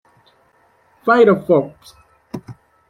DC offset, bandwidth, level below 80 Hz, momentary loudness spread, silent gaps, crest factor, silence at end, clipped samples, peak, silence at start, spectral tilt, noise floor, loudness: under 0.1%; 12.5 kHz; -60 dBFS; 22 LU; none; 18 dB; 0.4 s; under 0.1%; -2 dBFS; 1.05 s; -7.5 dB/octave; -57 dBFS; -15 LUFS